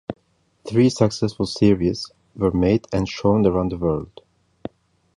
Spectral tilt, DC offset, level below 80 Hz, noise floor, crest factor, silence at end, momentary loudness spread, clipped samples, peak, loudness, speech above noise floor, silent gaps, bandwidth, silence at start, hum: -7 dB/octave; under 0.1%; -42 dBFS; -52 dBFS; 18 dB; 1.1 s; 20 LU; under 0.1%; -2 dBFS; -20 LUFS; 33 dB; none; 11 kHz; 0.1 s; none